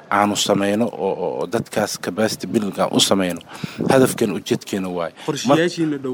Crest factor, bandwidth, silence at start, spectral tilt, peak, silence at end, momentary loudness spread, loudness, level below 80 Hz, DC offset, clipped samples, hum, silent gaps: 18 dB; over 20 kHz; 0 s; -4 dB/octave; -2 dBFS; 0 s; 9 LU; -20 LUFS; -60 dBFS; under 0.1%; under 0.1%; none; none